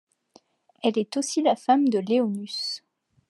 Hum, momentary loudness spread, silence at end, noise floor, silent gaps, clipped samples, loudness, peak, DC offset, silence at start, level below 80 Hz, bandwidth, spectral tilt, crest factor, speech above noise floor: none; 9 LU; 0.5 s; -59 dBFS; none; under 0.1%; -24 LUFS; -8 dBFS; under 0.1%; 0.85 s; -84 dBFS; 12 kHz; -4.5 dB/octave; 18 dB; 36 dB